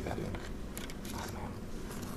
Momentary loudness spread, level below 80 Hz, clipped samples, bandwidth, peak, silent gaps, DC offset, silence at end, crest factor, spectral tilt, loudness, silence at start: 4 LU; -46 dBFS; under 0.1%; 15.5 kHz; -20 dBFS; none; 0.1%; 0 s; 20 dB; -5 dB/octave; -42 LUFS; 0 s